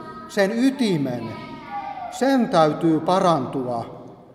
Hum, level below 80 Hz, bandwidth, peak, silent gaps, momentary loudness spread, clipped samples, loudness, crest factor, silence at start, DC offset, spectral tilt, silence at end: none; -60 dBFS; 14 kHz; -4 dBFS; none; 15 LU; under 0.1%; -21 LUFS; 18 dB; 0 s; under 0.1%; -6 dB/octave; 0.1 s